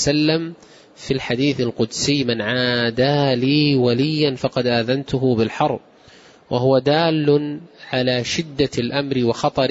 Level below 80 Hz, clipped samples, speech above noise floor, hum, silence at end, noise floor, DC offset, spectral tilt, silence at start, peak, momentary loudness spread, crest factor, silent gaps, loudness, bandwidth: -50 dBFS; under 0.1%; 29 dB; none; 0 s; -47 dBFS; under 0.1%; -5.5 dB/octave; 0 s; -4 dBFS; 7 LU; 14 dB; none; -19 LUFS; 8 kHz